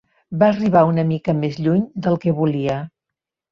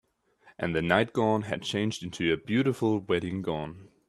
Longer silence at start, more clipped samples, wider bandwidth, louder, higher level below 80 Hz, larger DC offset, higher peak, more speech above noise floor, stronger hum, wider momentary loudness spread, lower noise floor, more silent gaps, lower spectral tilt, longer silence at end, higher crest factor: second, 0.3 s vs 0.45 s; neither; second, 7 kHz vs 13 kHz; first, -19 LUFS vs -28 LUFS; about the same, -56 dBFS vs -60 dBFS; neither; first, -2 dBFS vs -6 dBFS; first, 67 dB vs 33 dB; neither; about the same, 10 LU vs 8 LU; first, -84 dBFS vs -61 dBFS; neither; first, -9 dB/octave vs -6 dB/octave; first, 0.65 s vs 0.2 s; second, 16 dB vs 22 dB